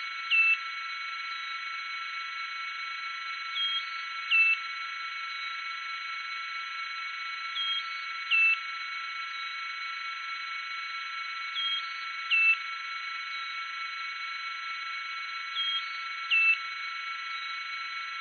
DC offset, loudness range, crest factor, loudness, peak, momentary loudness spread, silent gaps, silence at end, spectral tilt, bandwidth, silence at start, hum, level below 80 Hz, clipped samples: under 0.1%; 4 LU; 18 dB; -30 LUFS; -14 dBFS; 12 LU; none; 0 s; 8 dB/octave; 6.6 kHz; 0 s; none; under -90 dBFS; under 0.1%